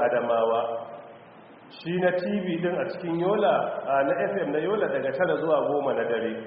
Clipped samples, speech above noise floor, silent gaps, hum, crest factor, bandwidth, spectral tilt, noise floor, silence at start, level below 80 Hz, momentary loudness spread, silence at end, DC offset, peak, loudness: under 0.1%; 23 dB; none; none; 14 dB; 5 kHz; -4.5 dB/octave; -49 dBFS; 0 s; -70 dBFS; 7 LU; 0 s; under 0.1%; -12 dBFS; -26 LUFS